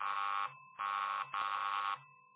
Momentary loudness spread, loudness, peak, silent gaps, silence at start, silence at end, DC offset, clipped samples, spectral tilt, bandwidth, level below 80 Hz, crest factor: 6 LU; -38 LUFS; -26 dBFS; none; 0 s; 0.2 s; under 0.1%; under 0.1%; 2.5 dB/octave; 4 kHz; under -90 dBFS; 14 dB